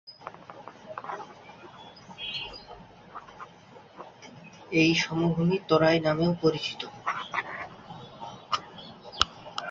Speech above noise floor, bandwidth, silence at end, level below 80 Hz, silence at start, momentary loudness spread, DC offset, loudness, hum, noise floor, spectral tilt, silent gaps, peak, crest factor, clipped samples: 27 dB; 7.8 kHz; 0 s; -58 dBFS; 0.05 s; 24 LU; under 0.1%; -28 LUFS; none; -51 dBFS; -5 dB/octave; none; -2 dBFS; 28 dB; under 0.1%